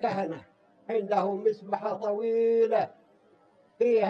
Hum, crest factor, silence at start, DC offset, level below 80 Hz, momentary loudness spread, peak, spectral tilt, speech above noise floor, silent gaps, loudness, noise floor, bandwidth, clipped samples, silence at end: none; 16 dB; 0 s; under 0.1%; -82 dBFS; 12 LU; -12 dBFS; -7.5 dB/octave; 35 dB; none; -28 LUFS; -62 dBFS; 6.4 kHz; under 0.1%; 0 s